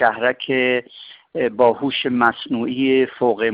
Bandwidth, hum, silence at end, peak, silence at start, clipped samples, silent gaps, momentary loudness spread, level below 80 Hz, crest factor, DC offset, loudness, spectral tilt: 5.2 kHz; none; 0 s; -4 dBFS; 0 s; under 0.1%; none; 7 LU; -62 dBFS; 16 dB; under 0.1%; -19 LUFS; -8 dB/octave